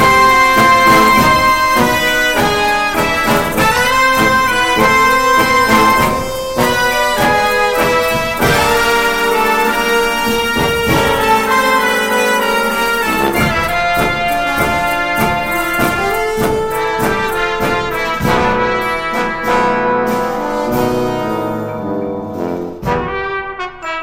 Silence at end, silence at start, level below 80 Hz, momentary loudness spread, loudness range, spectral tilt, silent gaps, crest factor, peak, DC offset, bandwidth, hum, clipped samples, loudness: 0 s; 0 s; -32 dBFS; 9 LU; 5 LU; -3.5 dB/octave; none; 14 dB; 0 dBFS; under 0.1%; 16.5 kHz; none; under 0.1%; -13 LUFS